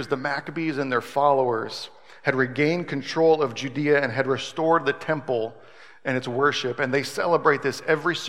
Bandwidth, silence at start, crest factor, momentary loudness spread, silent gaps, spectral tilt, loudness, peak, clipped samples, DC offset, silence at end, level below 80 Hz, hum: 15.5 kHz; 0 s; 20 dB; 8 LU; none; -5 dB/octave; -24 LUFS; -4 dBFS; under 0.1%; 0.3%; 0 s; -74 dBFS; none